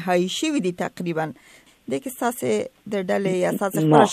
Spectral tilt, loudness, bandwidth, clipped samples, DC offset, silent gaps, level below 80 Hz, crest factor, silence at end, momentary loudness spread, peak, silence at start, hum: -5.5 dB/octave; -23 LUFS; 15.5 kHz; under 0.1%; under 0.1%; none; -66 dBFS; 22 dB; 0 s; 9 LU; 0 dBFS; 0 s; none